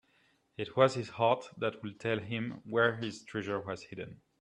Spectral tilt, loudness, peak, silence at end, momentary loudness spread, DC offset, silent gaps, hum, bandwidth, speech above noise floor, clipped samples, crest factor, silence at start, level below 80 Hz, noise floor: -6 dB/octave; -33 LUFS; -12 dBFS; 0.25 s; 14 LU; under 0.1%; none; none; 10.5 kHz; 38 dB; under 0.1%; 22 dB; 0.6 s; -72 dBFS; -71 dBFS